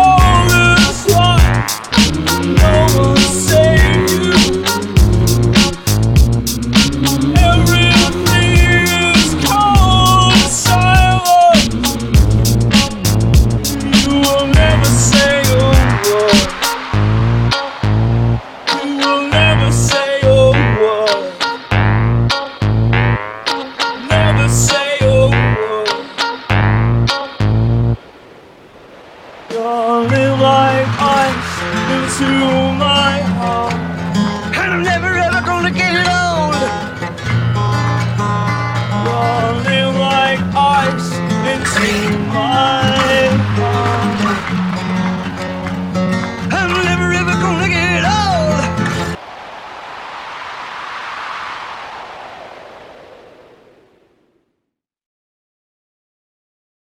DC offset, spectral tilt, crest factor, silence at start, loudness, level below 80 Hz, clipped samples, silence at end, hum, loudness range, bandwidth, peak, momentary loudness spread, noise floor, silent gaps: under 0.1%; -4.5 dB/octave; 12 dB; 0 s; -13 LUFS; -22 dBFS; under 0.1%; 3.9 s; none; 7 LU; 17.5 kHz; 0 dBFS; 9 LU; -76 dBFS; none